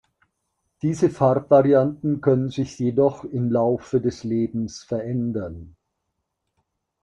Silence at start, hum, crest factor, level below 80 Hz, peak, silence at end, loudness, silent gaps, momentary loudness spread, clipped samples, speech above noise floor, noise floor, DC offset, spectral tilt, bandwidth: 0.85 s; none; 20 dB; -56 dBFS; -2 dBFS; 1.35 s; -22 LUFS; none; 12 LU; under 0.1%; 57 dB; -78 dBFS; under 0.1%; -8 dB/octave; 10 kHz